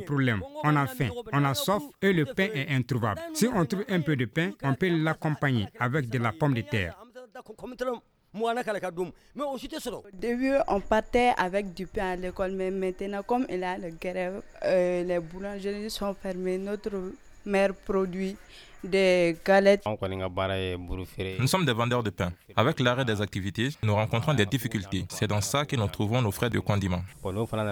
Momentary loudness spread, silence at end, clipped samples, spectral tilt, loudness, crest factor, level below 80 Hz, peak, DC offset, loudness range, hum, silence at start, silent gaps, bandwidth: 10 LU; 0 s; under 0.1%; -5.5 dB/octave; -28 LUFS; 20 dB; -50 dBFS; -8 dBFS; under 0.1%; 5 LU; none; 0 s; none; over 20 kHz